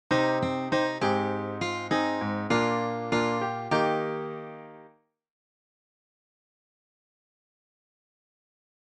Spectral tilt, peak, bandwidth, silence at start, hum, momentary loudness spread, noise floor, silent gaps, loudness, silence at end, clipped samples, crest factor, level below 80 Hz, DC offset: -5.5 dB/octave; -10 dBFS; 10 kHz; 0.1 s; none; 11 LU; -59 dBFS; none; -28 LUFS; 4 s; under 0.1%; 20 dB; -66 dBFS; under 0.1%